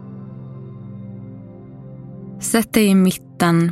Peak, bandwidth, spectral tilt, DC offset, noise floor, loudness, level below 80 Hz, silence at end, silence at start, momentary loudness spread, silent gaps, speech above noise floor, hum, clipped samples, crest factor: 0 dBFS; 16 kHz; -5.5 dB/octave; under 0.1%; -37 dBFS; -17 LUFS; -54 dBFS; 0 s; 0 s; 23 LU; none; 21 dB; none; under 0.1%; 20 dB